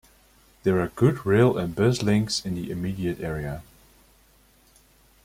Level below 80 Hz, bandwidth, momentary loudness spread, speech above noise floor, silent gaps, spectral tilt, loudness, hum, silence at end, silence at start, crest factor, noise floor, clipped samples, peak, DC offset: -50 dBFS; 16 kHz; 11 LU; 35 dB; none; -6 dB/octave; -24 LUFS; none; 1.65 s; 0.65 s; 20 dB; -58 dBFS; under 0.1%; -6 dBFS; under 0.1%